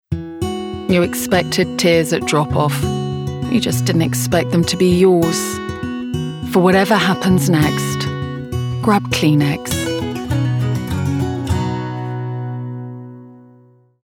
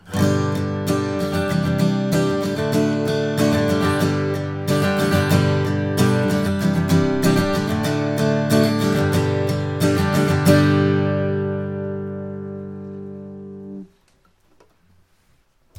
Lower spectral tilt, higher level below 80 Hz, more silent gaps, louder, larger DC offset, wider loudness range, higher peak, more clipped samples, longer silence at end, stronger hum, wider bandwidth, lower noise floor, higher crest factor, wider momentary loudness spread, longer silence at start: about the same, -5.5 dB/octave vs -6.5 dB/octave; first, -42 dBFS vs -48 dBFS; neither; about the same, -17 LUFS vs -19 LUFS; neither; second, 6 LU vs 12 LU; about the same, 0 dBFS vs 0 dBFS; neither; second, 0.65 s vs 1.95 s; neither; about the same, 19 kHz vs 17.5 kHz; second, -49 dBFS vs -59 dBFS; about the same, 16 dB vs 20 dB; second, 11 LU vs 14 LU; about the same, 0.1 s vs 0.05 s